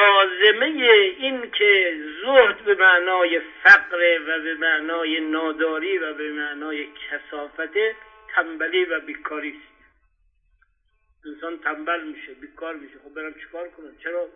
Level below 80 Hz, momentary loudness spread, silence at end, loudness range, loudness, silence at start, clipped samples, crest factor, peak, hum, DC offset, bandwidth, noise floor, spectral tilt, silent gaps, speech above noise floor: -64 dBFS; 21 LU; 0.05 s; 16 LU; -19 LUFS; 0 s; under 0.1%; 20 dB; 0 dBFS; none; under 0.1%; 6.8 kHz; -66 dBFS; -3 dB/octave; none; 44 dB